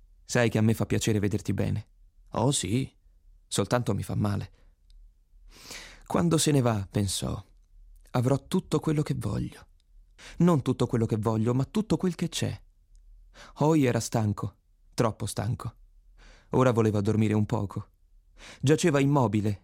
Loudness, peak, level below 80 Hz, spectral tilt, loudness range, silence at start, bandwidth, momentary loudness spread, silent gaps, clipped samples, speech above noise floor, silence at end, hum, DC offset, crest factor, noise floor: -27 LUFS; -8 dBFS; -52 dBFS; -6 dB/octave; 3 LU; 0.3 s; 16 kHz; 13 LU; none; under 0.1%; 31 dB; 0.05 s; none; under 0.1%; 18 dB; -57 dBFS